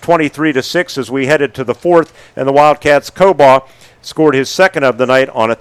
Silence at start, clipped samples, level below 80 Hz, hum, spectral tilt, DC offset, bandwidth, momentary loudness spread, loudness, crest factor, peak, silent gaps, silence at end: 0 s; 0.8%; -48 dBFS; none; -5 dB/octave; under 0.1%; 15 kHz; 9 LU; -11 LUFS; 12 dB; 0 dBFS; none; 0.05 s